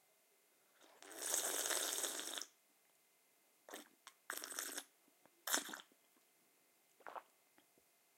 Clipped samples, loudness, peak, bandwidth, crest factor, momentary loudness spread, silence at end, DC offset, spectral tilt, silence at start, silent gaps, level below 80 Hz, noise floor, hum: under 0.1%; -42 LUFS; -16 dBFS; 16.5 kHz; 34 dB; 21 LU; 0.95 s; under 0.1%; 1.5 dB/octave; 0.8 s; none; under -90 dBFS; -75 dBFS; none